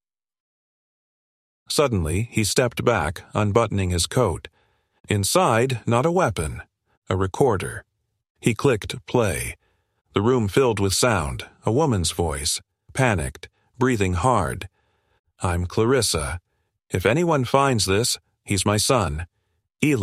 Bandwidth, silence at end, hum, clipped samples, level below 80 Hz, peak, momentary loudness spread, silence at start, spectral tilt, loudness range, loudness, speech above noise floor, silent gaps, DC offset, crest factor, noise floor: 15.5 kHz; 0 s; none; under 0.1%; -42 dBFS; -2 dBFS; 10 LU; 1.7 s; -4.5 dB/octave; 3 LU; -22 LUFS; 23 dB; 5.00-5.04 s, 6.97-7.02 s, 8.30-8.35 s, 15.19-15.24 s; under 0.1%; 20 dB; -44 dBFS